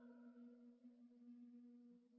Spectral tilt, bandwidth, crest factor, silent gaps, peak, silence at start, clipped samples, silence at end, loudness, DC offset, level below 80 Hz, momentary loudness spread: -5 dB/octave; 3.7 kHz; 10 dB; none; -54 dBFS; 0 s; under 0.1%; 0 s; -65 LUFS; under 0.1%; under -90 dBFS; 4 LU